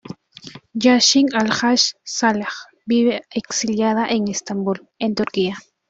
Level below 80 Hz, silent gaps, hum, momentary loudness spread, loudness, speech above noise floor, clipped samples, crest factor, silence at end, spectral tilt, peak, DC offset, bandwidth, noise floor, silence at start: -60 dBFS; none; none; 16 LU; -18 LUFS; 22 dB; under 0.1%; 18 dB; 0.3 s; -3 dB/octave; -2 dBFS; under 0.1%; 8 kHz; -41 dBFS; 0.05 s